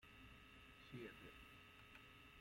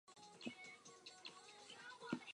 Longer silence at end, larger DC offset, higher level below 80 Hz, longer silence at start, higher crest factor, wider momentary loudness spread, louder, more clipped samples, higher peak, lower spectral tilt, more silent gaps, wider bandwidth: about the same, 0 s vs 0 s; neither; first, -72 dBFS vs under -90 dBFS; about the same, 0 s vs 0.05 s; second, 18 dB vs 26 dB; second, 6 LU vs 9 LU; second, -61 LUFS vs -55 LUFS; neither; second, -42 dBFS vs -30 dBFS; first, -5 dB/octave vs -3.5 dB/octave; neither; first, 16.5 kHz vs 11 kHz